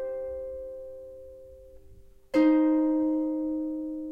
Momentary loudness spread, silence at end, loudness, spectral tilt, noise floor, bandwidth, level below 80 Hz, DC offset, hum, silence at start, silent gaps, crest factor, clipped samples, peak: 22 LU; 0 s; -27 LUFS; -7 dB/octave; -51 dBFS; 5.4 kHz; -56 dBFS; under 0.1%; none; 0 s; none; 16 dB; under 0.1%; -14 dBFS